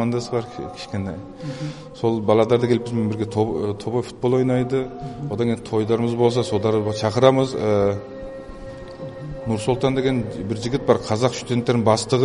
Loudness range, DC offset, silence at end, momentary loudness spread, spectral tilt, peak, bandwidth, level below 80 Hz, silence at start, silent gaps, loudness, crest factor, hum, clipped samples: 3 LU; under 0.1%; 0 s; 15 LU; -6.5 dB/octave; 0 dBFS; 11.5 kHz; -48 dBFS; 0 s; none; -21 LUFS; 20 dB; none; under 0.1%